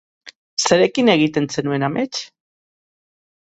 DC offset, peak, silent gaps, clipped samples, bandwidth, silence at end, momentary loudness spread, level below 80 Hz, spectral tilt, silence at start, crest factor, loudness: under 0.1%; 0 dBFS; 0.35-0.57 s; under 0.1%; 8.2 kHz; 1.15 s; 12 LU; -60 dBFS; -4 dB/octave; 0.25 s; 20 dB; -18 LUFS